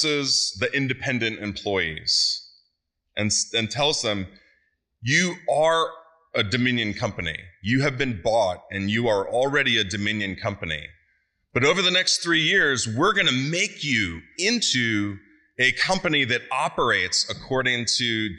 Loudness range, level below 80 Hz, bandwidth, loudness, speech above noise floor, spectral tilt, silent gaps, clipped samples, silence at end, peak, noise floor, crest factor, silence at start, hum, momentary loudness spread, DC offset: 4 LU; -54 dBFS; 11.5 kHz; -22 LUFS; 52 dB; -3 dB/octave; none; under 0.1%; 0 s; -6 dBFS; -75 dBFS; 18 dB; 0 s; none; 10 LU; under 0.1%